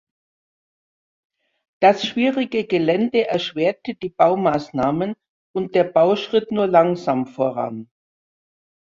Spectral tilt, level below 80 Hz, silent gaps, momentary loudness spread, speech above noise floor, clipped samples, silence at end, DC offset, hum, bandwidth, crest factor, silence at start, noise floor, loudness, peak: -6.5 dB/octave; -60 dBFS; 5.29-5.54 s; 11 LU; over 71 dB; under 0.1%; 1.05 s; under 0.1%; none; 7.4 kHz; 18 dB; 1.8 s; under -90 dBFS; -20 LUFS; -2 dBFS